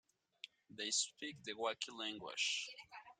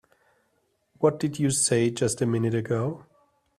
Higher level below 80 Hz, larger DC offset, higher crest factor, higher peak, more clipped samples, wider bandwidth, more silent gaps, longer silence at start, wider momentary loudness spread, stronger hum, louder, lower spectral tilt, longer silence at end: second, -86 dBFS vs -62 dBFS; neither; about the same, 22 dB vs 20 dB; second, -22 dBFS vs -8 dBFS; neither; about the same, 13.5 kHz vs 14.5 kHz; neither; second, 0.45 s vs 1 s; first, 17 LU vs 7 LU; neither; second, -41 LUFS vs -25 LUFS; second, 0 dB/octave vs -5 dB/octave; second, 0.05 s vs 0.55 s